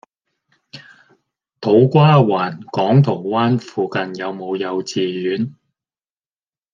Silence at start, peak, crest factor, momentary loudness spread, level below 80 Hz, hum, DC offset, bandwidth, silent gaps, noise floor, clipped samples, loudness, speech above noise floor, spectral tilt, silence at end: 0.75 s; -2 dBFS; 16 dB; 13 LU; -62 dBFS; none; under 0.1%; 7.4 kHz; none; under -90 dBFS; under 0.1%; -17 LUFS; over 74 dB; -7.5 dB/octave; 1.2 s